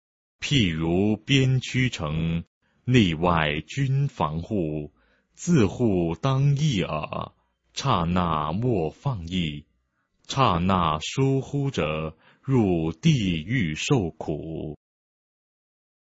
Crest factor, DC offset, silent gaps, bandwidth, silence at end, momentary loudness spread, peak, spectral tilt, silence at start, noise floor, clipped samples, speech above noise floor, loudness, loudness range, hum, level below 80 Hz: 20 dB; under 0.1%; 2.47-2.61 s; 8 kHz; 1.35 s; 12 LU; -4 dBFS; -6 dB/octave; 0.4 s; -72 dBFS; under 0.1%; 48 dB; -24 LUFS; 3 LU; none; -46 dBFS